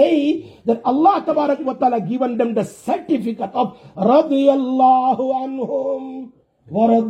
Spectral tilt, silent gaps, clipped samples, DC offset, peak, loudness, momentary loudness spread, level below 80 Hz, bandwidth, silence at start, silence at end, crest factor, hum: -7.5 dB/octave; none; under 0.1%; under 0.1%; -2 dBFS; -18 LUFS; 10 LU; -64 dBFS; 11.5 kHz; 0 s; 0 s; 14 dB; none